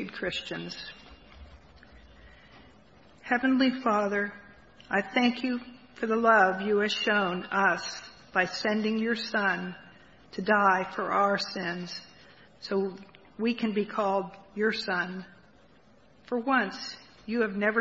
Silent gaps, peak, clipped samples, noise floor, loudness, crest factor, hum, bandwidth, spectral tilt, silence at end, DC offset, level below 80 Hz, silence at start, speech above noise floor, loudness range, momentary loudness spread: none; -8 dBFS; under 0.1%; -59 dBFS; -28 LUFS; 22 dB; none; 8 kHz; -5 dB/octave; 0 s; under 0.1%; -62 dBFS; 0 s; 32 dB; 6 LU; 16 LU